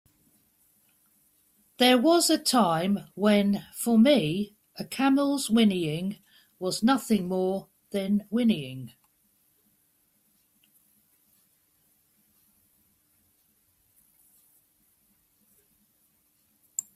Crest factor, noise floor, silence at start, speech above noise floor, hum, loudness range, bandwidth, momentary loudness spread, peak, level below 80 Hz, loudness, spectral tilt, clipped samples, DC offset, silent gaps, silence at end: 20 dB; -69 dBFS; 1.8 s; 45 dB; none; 9 LU; 15.5 kHz; 15 LU; -8 dBFS; -68 dBFS; -25 LUFS; -4.5 dB/octave; under 0.1%; under 0.1%; none; 0.15 s